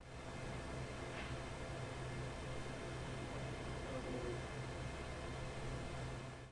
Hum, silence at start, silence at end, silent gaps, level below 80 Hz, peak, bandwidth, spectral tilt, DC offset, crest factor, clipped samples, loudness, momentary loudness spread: none; 0 s; 0 s; none; -54 dBFS; -32 dBFS; 11.5 kHz; -5.5 dB/octave; under 0.1%; 14 dB; under 0.1%; -47 LUFS; 2 LU